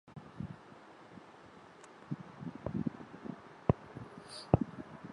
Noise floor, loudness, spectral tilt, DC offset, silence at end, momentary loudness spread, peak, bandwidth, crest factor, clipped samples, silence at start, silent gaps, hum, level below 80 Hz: -56 dBFS; -39 LUFS; -8 dB/octave; under 0.1%; 0 s; 22 LU; -8 dBFS; 11.5 kHz; 32 dB; under 0.1%; 0.05 s; none; none; -54 dBFS